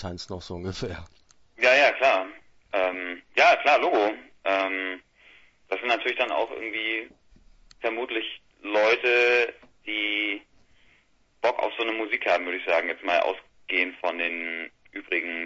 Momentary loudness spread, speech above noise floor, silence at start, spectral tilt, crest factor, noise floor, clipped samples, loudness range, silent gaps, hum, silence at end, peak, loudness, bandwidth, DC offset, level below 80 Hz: 16 LU; 37 dB; 0 s; -4 dB/octave; 20 dB; -63 dBFS; under 0.1%; 6 LU; none; none; 0 s; -6 dBFS; -25 LUFS; 8 kHz; under 0.1%; -60 dBFS